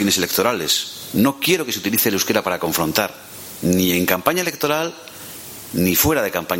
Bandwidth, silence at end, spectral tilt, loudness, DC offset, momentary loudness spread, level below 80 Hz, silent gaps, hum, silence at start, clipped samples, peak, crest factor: 17 kHz; 0 s; -3.5 dB/octave; -18 LUFS; under 0.1%; 16 LU; -48 dBFS; none; none; 0 s; under 0.1%; 0 dBFS; 20 dB